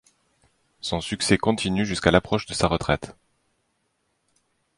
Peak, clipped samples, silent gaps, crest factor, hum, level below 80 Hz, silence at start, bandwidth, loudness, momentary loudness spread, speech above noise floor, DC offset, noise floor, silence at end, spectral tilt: -2 dBFS; under 0.1%; none; 24 dB; none; -44 dBFS; 0.85 s; 11.5 kHz; -23 LUFS; 9 LU; 50 dB; under 0.1%; -72 dBFS; 1.65 s; -4.5 dB/octave